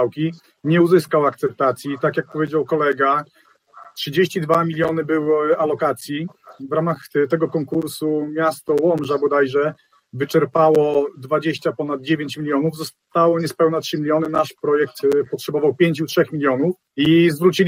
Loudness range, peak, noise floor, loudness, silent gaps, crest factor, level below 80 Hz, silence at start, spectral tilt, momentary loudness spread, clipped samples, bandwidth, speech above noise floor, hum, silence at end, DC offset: 2 LU; -2 dBFS; -45 dBFS; -19 LUFS; none; 16 dB; -64 dBFS; 0 s; -6.5 dB/octave; 9 LU; under 0.1%; 16.5 kHz; 27 dB; none; 0 s; under 0.1%